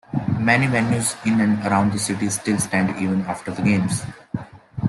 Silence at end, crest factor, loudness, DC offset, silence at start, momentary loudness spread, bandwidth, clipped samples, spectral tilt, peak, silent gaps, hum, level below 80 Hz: 0 s; 18 dB; -20 LUFS; under 0.1%; 0.1 s; 12 LU; 12.5 kHz; under 0.1%; -5 dB/octave; -2 dBFS; none; none; -52 dBFS